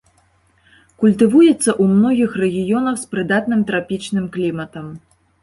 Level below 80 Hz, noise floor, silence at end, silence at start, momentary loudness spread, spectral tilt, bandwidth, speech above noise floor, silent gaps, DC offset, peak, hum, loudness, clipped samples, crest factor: -54 dBFS; -57 dBFS; 0.45 s; 1 s; 11 LU; -6 dB/octave; 11.5 kHz; 41 dB; none; under 0.1%; -2 dBFS; none; -16 LUFS; under 0.1%; 16 dB